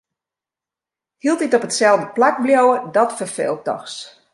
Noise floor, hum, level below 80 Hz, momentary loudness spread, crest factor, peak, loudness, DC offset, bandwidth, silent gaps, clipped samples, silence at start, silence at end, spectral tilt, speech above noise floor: -88 dBFS; none; -72 dBFS; 11 LU; 16 dB; -2 dBFS; -17 LUFS; under 0.1%; 11.5 kHz; none; under 0.1%; 1.25 s; 0.25 s; -3.5 dB/octave; 71 dB